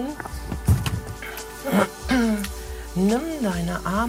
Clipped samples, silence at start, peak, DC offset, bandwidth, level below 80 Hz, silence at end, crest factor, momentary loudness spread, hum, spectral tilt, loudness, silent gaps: under 0.1%; 0 s; -6 dBFS; under 0.1%; 16 kHz; -36 dBFS; 0 s; 18 dB; 11 LU; none; -6 dB/octave; -25 LUFS; none